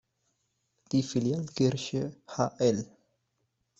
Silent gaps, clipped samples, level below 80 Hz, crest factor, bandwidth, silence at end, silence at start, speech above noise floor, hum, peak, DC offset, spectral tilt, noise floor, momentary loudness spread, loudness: none; under 0.1%; -66 dBFS; 20 dB; 8.2 kHz; 0.95 s; 0.9 s; 49 dB; none; -12 dBFS; under 0.1%; -6 dB/octave; -78 dBFS; 8 LU; -30 LUFS